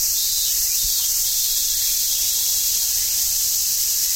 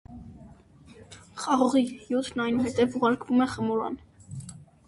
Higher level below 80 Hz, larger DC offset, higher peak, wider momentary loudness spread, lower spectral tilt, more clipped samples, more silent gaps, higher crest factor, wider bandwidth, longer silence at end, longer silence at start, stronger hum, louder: first, -44 dBFS vs -56 dBFS; neither; first, -6 dBFS vs -10 dBFS; second, 0 LU vs 21 LU; second, 3 dB/octave vs -5.5 dB/octave; neither; neither; about the same, 14 dB vs 18 dB; first, 17 kHz vs 11.5 kHz; second, 0 s vs 0.25 s; about the same, 0 s vs 0.1 s; neither; first, -17 LUFS vs -26 LUFS